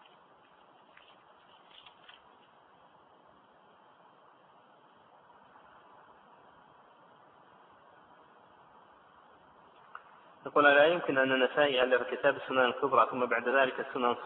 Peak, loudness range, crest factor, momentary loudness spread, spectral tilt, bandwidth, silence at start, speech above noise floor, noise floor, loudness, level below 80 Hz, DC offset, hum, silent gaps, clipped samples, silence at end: -10 dBFS; 4 LU; 22 dB; 22 LU; -7.5 dB/octave; 4.1 kHz; 9.95 s; 33 dB; -61 dBFS; -27 LUFS; -78 dBFS; under 0.1%; none; none; under 0.1%; 0 s